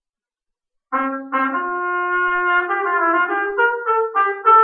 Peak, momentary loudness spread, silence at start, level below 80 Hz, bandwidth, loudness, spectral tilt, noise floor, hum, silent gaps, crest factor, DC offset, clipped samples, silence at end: -2 dBFS; 5 LU; 0.9 s; -62 dBFS; 3.8 kHz; -18 LUFS; -6 dB/octave; -85 dBFS; none; none; 16 dB; under 0.1%; under 0.1%; 0 s